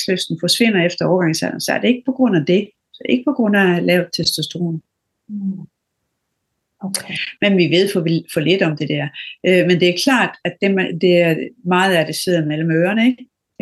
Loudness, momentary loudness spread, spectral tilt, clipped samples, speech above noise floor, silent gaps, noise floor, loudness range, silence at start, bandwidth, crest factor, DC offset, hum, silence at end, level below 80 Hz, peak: -17 LUFS; 11 LU; -5 dB/octave; under 0.1%; 57 dB; none; -74 dBFS; 6 LU; 0 s; 12.5 kHz; 16 dB; under 0.1%; none; 0.35 s; -64 dBFS; -2 dBFS